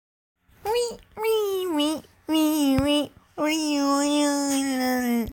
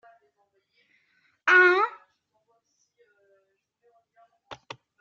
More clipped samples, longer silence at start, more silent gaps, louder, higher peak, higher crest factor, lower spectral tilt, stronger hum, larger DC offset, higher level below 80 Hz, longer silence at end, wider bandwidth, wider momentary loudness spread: neither; second, 0.65 s vs 1.45 s; neither; second, -24 LUFS vs -20 LUFS; about the same, -10 dBFS vs -8 dBFS; about the same, 16 dB vs 20 dB; about the same, -3.5 dB/octave vs -3 dB/octave; neither; neither; first, -50 dBFS vs -82 dBFS; second, 0 s vs 0.45 s; first, 17 kHz vs 7.2 kHz; second, 8 LU vs 26 LU